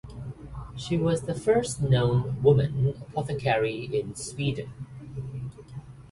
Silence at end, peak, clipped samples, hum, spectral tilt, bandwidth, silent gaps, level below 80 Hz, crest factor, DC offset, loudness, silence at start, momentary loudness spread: 0.05 s; -8 dBFS; under 0.1%; none; -6.5 dB/octave; 11.5 kHz; none; -48 dBFS; 18 dB; under 0.1%; -26 LUFS; 0.05 s; 18 LU